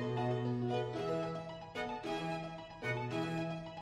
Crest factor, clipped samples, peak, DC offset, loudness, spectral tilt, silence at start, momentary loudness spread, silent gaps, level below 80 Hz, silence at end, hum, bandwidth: 14 dB; under 0.1%; -24 dBFS; under 0.1%; -39 LUFS; -7 dB/octave; 0 s; 7 LU; none; -64 dBFS; 0 s; none; 11.5 kHz